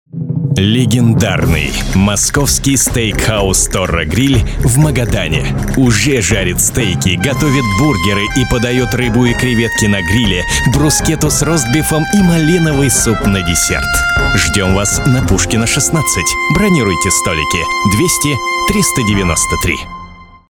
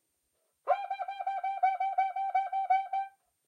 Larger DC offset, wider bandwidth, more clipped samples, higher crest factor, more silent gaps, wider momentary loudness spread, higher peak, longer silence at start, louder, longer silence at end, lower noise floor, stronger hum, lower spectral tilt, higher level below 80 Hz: neither; first, 19.5 kHz vs 5.6 kHz; neither; about the same, 12 dB vs 16 dB; neither; second, 3 LU vs 7 LU; first, 0 dBFS vs -16 dBFS; second, 0.15 s vs 0.65 s; first, -12 LUFS vs -32 LUFS; about the same, 0.3 s vs 0.4 s; second, -34 dBFS vs -78 dBFS; neither; first, -4 dB/octave vs 0 dB/octave; first, -24 dBFS vs under -90 dBFS